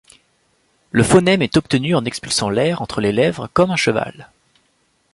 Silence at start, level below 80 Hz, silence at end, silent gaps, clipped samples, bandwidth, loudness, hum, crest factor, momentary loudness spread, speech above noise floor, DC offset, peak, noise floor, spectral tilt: 0.95 s; -46 dBFS; 0.9 s; none; under 0.1%; 11.5 kHz; -17 LUFS; none; 16 dB; 7 LU; 46 dB; under 0.1%; -2 dBFS; -63 dBFS; -5 dB/octave